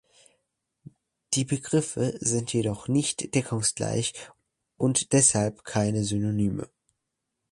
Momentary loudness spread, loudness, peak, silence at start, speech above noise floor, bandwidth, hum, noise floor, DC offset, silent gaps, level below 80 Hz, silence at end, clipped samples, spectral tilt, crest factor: 9 LU; -26 LUFS; -6 dBFS; 1.3 s; 56 dB; 11.5 kHz; none; -82 dBFS; under 0.1%; none; -56 dBFS; 0.85 s; under 0.1%; -4.5 dB/octave; 22 dB